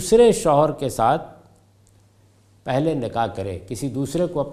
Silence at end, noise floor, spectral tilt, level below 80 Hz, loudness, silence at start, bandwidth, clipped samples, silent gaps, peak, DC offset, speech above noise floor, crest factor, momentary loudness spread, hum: 0 s; -55 dBFS; -5.5 dB/octave; -46 dBFS; -21 LUFS; 0 s; 15.5 kHz; under 0.1%; none; -4 dBFS; under 0.1%; 36 dB; 18 dB; 15 LU; none